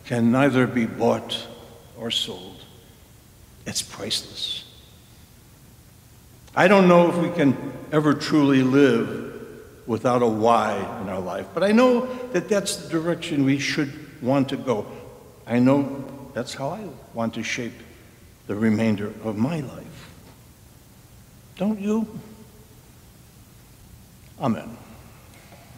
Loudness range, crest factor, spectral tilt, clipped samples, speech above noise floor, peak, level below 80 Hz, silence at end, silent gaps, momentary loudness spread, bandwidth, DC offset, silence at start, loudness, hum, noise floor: 12 LU; 22 dB; -5.5 dB/octave; under 0.1%; 28 dB; -2 dBFS; -56 dBFS; 0 s; none; 19 LU; 16 kHz; under 0.1%; 0.05 s; -22 LUFS; none; -50 dBFS